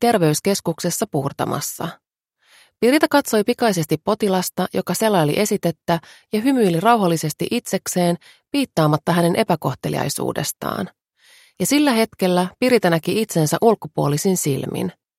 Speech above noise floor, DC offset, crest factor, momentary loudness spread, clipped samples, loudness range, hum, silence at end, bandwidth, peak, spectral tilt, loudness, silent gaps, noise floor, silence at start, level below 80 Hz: 44 dB; under 0.1%; 18 dB; 8 LU; under 0.1%; 2 LU; none; 0.25 s; 16.5 kHz; 0 dBFS; -5 dB/octave; -19 LUFS; none; -63 dBFS; 0 s; -58 dBFS